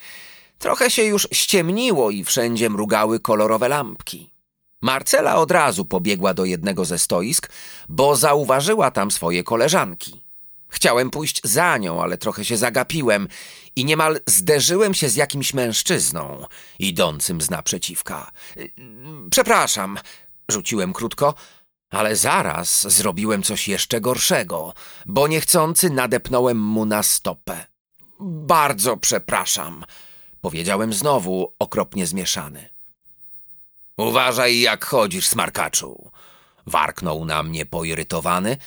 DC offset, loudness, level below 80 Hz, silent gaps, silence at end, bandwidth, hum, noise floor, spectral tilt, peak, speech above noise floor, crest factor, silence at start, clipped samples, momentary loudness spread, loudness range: under 0.1%; -19 LUFS; -52 dBFS; 27.80-27.85 s; 0 s; over 20 kHz; none; -58 dBFS; -3 dB/octave; -2 dBFS; 38 dB; 20 dB; 0 s; under 0.1%; 18 LU; 4 LU